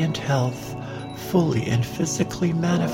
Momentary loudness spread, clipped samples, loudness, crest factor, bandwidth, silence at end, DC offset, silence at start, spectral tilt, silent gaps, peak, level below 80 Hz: 11 LU; under 0.1%; -24 LUFS; 16 dB; 16.5 kHz; 0 s; under 0.1%; 0 s; -6 dB/octave; none; -8 dBFS; -50 dBFS